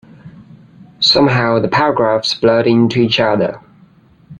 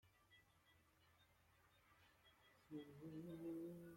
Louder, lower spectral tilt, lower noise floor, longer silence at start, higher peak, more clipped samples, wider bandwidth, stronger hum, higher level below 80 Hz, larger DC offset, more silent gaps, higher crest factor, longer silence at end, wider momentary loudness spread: first, -13 LUFS vs -55 LUFS; second, -5.5 dB/octave vs -7 dB/octave; second, -47 dBFS vs -77 dBFS; first, 0.25 s vs 0.05 s; first, 0 dBFS vs -44 dBFS; neither; second, 9.8 kHz vs 16.5 kHz; neither; first, -50 dBFS vs -86 dBFS; neither; neither; about the same, 14 dB vs 16 dB; about the same, 0 s vs 0 s; about the same, 5 LU vs 6 LU